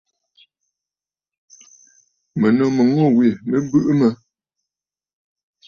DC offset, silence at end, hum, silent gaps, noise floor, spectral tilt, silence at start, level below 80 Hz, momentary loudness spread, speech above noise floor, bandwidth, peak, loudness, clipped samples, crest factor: under 0.1%; 1.55 s; none; none; under -90 dBFS; -8 dB/octave; 2.35 s; -60 dBFS; 7 LU; over 74 dB; 7 kHz; -4 dBFS; -17 LUFS; under 0.1%; 16 dB